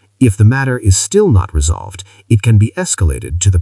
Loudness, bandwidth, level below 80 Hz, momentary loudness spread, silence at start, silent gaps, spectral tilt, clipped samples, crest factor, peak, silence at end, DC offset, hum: -13 LUFS; 12 kHz; -26 dBFS; 7 LU; 0.2 s; none; -5.5 dB/octave; under 0.1%; 12 dB; 0 dBFS; 0 s; under 0.1%; none